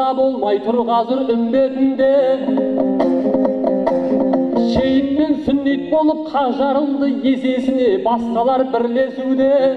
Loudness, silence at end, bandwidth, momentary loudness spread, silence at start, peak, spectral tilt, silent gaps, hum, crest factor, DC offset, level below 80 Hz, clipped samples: -16 LUFS; 0 s; 6.2 kHz; 3 LU; 0 s; -2 dBFS; -7.5 dB/octave; none; none; 14 dB; under 0.1%; -48 dBFS; under 0.1%